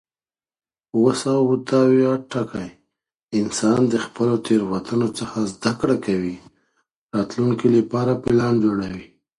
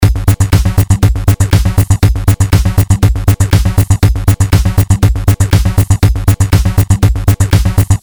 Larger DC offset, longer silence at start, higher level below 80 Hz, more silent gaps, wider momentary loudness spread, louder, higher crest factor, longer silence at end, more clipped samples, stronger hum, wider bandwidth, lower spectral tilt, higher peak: second, under 0.1% vs 0.9%; first, 0.95 s vs 0 s; second, -54 dBFS vs -16 dBFS; first, 6.96-7.09 s vs none; first, 10 LU vs 1 LU; second, -20 LUFS vs -11 LUFS; first, 18 dB vs 8 dB; first, 0.35 s vs 0.05 s; second, under 0.1% vs 0.7%; neither; second, 11.5 kHz vs over 20 kHz; about the same, -6.5 dB/octave vs -6 dB/octave; second, -4 dBFS vs 0 dBFS